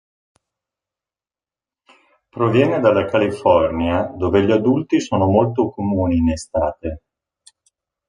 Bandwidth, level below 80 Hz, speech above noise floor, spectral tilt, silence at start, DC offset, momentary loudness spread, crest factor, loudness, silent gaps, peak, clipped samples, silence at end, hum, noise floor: 10.5 kHz; -36 dBFS; over 73 dB; -7 dB/octave; 2.35 s; under 0.1%; 7 LU; 18 dB; -18 LUFS; none; -2 dBFS; under 0.1%; 1.1 s; none; under -90 dBFS